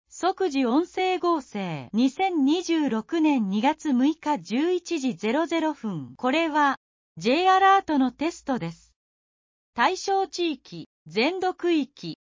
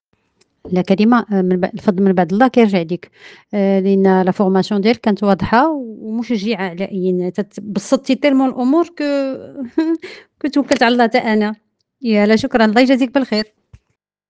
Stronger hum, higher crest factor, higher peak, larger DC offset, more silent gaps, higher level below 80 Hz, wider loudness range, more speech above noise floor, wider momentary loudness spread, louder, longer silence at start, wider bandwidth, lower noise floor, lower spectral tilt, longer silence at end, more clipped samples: neither; about the same, 16 dB vs 16 dB; second, -8 dBFS vs 0 dBFS; neither; first, 6.77-7.15 s, 8.96-9.73 s, 10.86-11.06 s vs none; second, -66 dBFS vs -52 dBFS; about the same, 4 LU vs 3 LU; first, over 66 dB vs 55 dB; about the same, 11 LU vs 12 LU; second, -24 LUFS vs -16 LUFS; second, 0.15 s vs 0.65 s; second, 7.6 kHz vs 9 kHz; first, under -90 dBFS vs -70 dBFS; second, -5 dB/octave vs -6.5 dB/octave; second, 0.25 s vs 0.85 s; neither